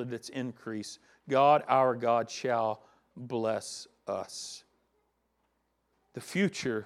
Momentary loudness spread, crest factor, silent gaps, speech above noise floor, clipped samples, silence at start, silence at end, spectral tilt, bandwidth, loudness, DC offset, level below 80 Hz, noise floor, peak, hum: 20 LU; 20 dB; none; 46 dB; under 0.1%; 0 s; 0 s; -5 dB/octave; 14 kHz; -30 LUFS; under 0.1%; -78 dBFS; -76 dBFS; -12 dBFS; 60 Hz at -70 dBFS